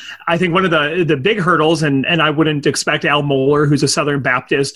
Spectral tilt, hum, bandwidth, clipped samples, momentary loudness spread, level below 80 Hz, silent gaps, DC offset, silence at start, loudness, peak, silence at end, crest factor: -4.5 dB/octave; none; 12.5 kHz; under 0.1%; 2 LU; -48 dBFS; none; under 0.1%; 0 s; -14 LUFS; -2 dBFS; 0.05 s; 14 dB